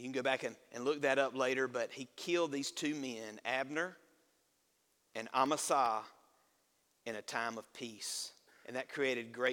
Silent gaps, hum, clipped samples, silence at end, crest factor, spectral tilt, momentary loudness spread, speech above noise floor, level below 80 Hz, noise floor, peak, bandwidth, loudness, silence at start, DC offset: none; none; under 0.1%; 0 s; 22 dB; -3 dB/octave; 13 LU; 40 dB; -86 dBFS; -77 dBFS; -16 dBFS; 18 kHz; -37 LUFS; 0 s; under 0.1%